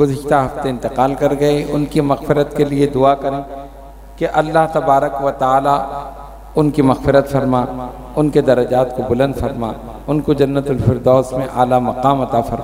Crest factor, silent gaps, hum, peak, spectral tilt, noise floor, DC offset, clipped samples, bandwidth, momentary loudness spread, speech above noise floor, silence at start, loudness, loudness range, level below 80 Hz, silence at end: 16 dB; none; none; 0 dBFS; -7.5 dB/octave; -35 dBFS; under 0.1%; under 0.1%; 16 kHz; 10 LU; 20 dB; 0 s; -16 LUFS; 1 LU; -36 dBFS; 0 s